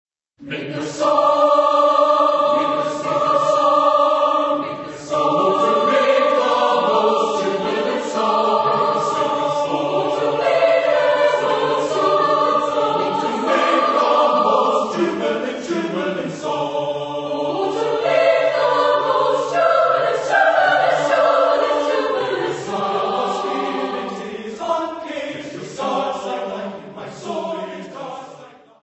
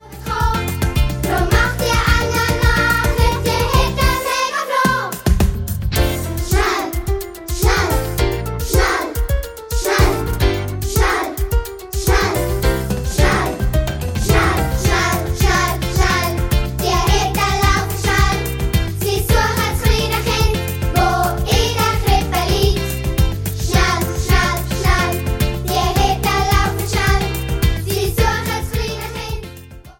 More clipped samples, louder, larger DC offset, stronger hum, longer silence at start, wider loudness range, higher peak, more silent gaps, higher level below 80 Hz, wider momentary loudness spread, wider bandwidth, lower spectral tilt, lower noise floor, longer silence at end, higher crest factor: neither; about the same, -18 LUFS vs -17 LUFS; neither; neither; first, 0.4 s vs 0.05 s; first, 8 LU vs 2 LU; about the same, -2 dBFS vs 0 dBFS; neither; second, -64 dBFS vs -20 dBFS; first, 12 LU vs 6 LU; second, 8.4 kHz vs 17 kHz; about the same, -4.5 dB/octave vs -4.5 dB/octave; first, -42 dBFS vs -36 dBFS; first, 0.35 s vs 0.1 s; about the same, 16 dB vs 16 dB